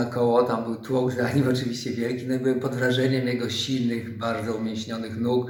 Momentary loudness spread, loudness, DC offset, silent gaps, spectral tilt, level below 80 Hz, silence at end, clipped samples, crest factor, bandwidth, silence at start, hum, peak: 7 LU; -25 LUFS; under 0.1%; none; -6 dB/octave; -62 dBFS; 0 s; under 0.1%; 18 dB; 17.5 kHz; 0 s; none; -8 dBFS